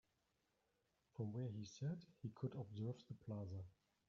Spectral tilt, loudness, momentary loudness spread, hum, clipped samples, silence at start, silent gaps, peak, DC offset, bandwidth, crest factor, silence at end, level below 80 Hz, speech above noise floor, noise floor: -9 dB/octave; -51 LUFS; 7 LU; none; under 0.1%; 1.15 s; none; -34 dBFS; under 0.1%; 7.2 kHz; 18 dB; 0.35 s; -82 dBFS; 36 dB; -86 dBFS